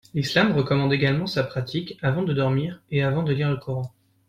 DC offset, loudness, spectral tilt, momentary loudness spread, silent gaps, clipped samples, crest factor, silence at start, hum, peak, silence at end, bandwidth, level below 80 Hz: under 0.1%; -24 LUFS; -7 dB/octave; 8 LU; none; under 0.1%; 18 dB; 0.15 s; none; -6 dBFS; 0.4 s; 13 kHz; -54 dBFS